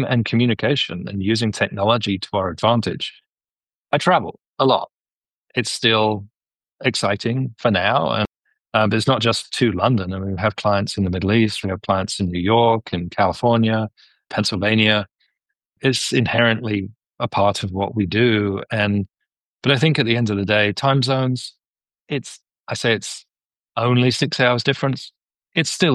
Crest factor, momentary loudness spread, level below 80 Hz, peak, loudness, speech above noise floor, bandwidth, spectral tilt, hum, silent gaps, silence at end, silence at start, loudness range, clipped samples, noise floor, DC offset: 18 dB; 11 LU; -54 dBFS; -2 dBFS; -19 LUFS; over 71 dB; 12.5 kHz; -5 dB/octave; none; 3.73-3.83 s, 5.12-5.21 s, 5.36-5.42 s, 6.56-6.60 s, 19.45-19.58 s, 21.68-21.74 s, 22.60-22.64 s, 23.45-23.50 s; 0 s; 0 s; 2 LU; under 0.1%; under -90 dBFS; under 0.1%